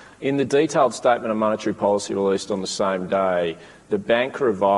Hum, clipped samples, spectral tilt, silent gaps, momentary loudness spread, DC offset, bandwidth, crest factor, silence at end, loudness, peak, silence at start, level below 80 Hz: none; under 0.1%; -5 dB/octave; none; 7 LU; under 0.1%; 11.5 kHz; 16 dB; 0 s; -22 LUFS; -4 dBFS; 0 s; -62 dBFS